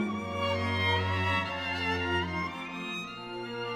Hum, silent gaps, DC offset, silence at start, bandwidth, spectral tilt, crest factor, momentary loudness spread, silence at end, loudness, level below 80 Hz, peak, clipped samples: none; none; under 0.1%; 0 s; 12.5 kHz; -5.5 dB/octave; 16 dB; 9 LU; 0 s; -31 LUFS; -56 dBFS; -16 dBFS; under 0.1%